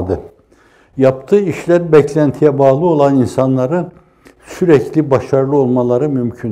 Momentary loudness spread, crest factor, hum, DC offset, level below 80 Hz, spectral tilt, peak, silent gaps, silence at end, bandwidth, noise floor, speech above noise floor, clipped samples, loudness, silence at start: 9 LU; 14 dB; none; under 0.1%; -48 dBFS; -8.5 dB/octave; 0 dBFS; none; 0 s; 12.5 kHz; -49 dBFS; 37 dB; under 0.1%; -13 LUFS; 0 s